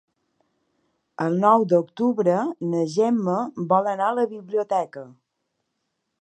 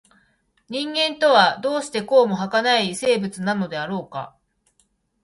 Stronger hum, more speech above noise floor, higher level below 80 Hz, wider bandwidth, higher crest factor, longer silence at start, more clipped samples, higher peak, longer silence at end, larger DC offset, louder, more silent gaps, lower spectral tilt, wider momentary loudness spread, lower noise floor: neither; first, 55 dB vs 46 dB; second, -78 dBFS vs -66 dBFS; second, 9.2 kHz vs 11.5 kHz; about the same, 20 dB vs 20 dB; first, 1.2 s vs 0.7 s; neither; about the same, -4 dBFS vs -2 dBFS; first, 1.1 s vs 0.95 s; neither; about the same, -22 LUFS vs -20 LUFS; neither; first, -7.5 dB/octave vs -4 dB/octave; second, 8 LU vs 14 LU; first, -77 dBFS vs -66 dBFS